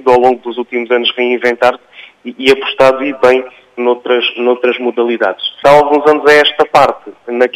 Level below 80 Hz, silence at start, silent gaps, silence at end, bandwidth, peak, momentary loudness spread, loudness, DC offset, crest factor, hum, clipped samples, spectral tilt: -50 dBFS; 0.05 s; none; 0.05 s; 15 kHz; 0 dBFS; 11 LU; -11 LUFS; under 0.1%; 12 dB; none; 0.2%; -4 dB/octave